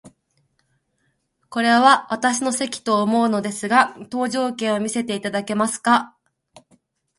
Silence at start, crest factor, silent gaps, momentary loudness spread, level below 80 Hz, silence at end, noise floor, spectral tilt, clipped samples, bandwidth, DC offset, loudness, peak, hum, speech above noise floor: 0.05 s; 22 dB; none; 9 LU; -68 dBFS; 1.1 s; -69 dBFS; -3.5 dB/octave; under 0.1%; 11.5 kHz; under 0.1%; -20 LUFS; 0 dBFS; none; 50 dB